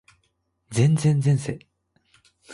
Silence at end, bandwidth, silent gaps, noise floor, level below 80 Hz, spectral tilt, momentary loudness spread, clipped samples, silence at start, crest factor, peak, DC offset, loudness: 0 s; 11.5 kHz; none; -71 dBFS; -58 dBFS; -7 dB/octave; 14 LU; under 0.1%; 0.7 s; 16 dB; -8 dBFS; under 0.1%; -22 LUFS